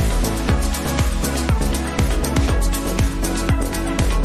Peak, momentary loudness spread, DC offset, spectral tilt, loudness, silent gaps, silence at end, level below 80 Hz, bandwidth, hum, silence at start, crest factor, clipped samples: -4 dBFS; 2 LU; 0.3%; -5 dB/octave; -21 LUFS; none; 0 s; -20 dBFS; 14.5 kHz; none; 0 s; 14 dB; under 0.1%